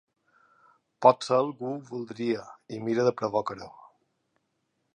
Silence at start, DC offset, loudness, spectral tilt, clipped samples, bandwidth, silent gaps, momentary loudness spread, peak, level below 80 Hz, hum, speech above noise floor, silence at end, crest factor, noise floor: 1 s; under 0.1%; -27 LUFS; -6 dB/octave; under 0.1%; 10 kHz; none; 16 LU; -4 dBFS; -74 dBFS; none; 50 dB; 1.25 s; 26 dB; -77 dBFS